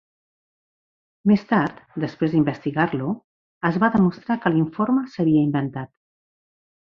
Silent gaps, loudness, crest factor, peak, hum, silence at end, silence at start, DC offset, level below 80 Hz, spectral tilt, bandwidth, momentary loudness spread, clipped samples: 3.24-3.61 s; -22 LUFS; 18 dB; -4 dBFS; none; 1 s; 1.25 s; under 0.1%; -58 dBFS; -9 dB/octave; 6.4 kHz; 11 LU; under 0.1%